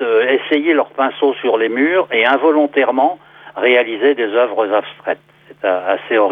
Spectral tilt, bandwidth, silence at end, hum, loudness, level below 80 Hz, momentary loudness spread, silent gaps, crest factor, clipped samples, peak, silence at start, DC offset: -6.5 dB/octave; 4.6 kHz; 0 s; none; -15 LUFS; -72 dBFS; 9 LU; none; 14 dB; under 0.1%; 0 dBFS; 0 s; under 0.1%